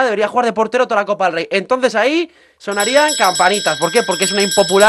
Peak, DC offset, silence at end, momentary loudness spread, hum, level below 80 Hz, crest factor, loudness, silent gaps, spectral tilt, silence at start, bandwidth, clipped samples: 0 dBFS; under 0.1%; 0 s; 6 LU; none; -60 dBFS; 14 dB; -14 LUFS; none; -2.5 dB/octave; 0 s; 13 kHz; under 0.1%